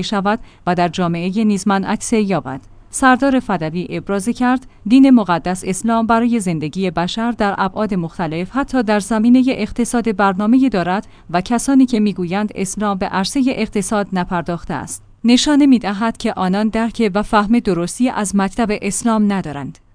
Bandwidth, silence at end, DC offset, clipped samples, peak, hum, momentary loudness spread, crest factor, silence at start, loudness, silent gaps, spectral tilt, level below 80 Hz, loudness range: 10.5 kHz; 0.2 s; under 0.1%; under 0.1%; 0 dBFS; none; 9 LU; 16 dB; 0 s; -16 LUFS; none; -5 dB/octave; -40 dBFS; 3 LU